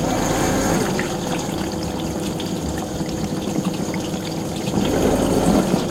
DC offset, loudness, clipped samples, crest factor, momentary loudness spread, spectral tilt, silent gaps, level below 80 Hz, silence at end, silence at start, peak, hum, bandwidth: under 0.1%; -22 LUFS; under 0.1%; 16 dB; 7 LU; -5 dB/octave; none; -36 dBFS; 0 s; 0 s; -4 dBFS; none; 16.5 kHz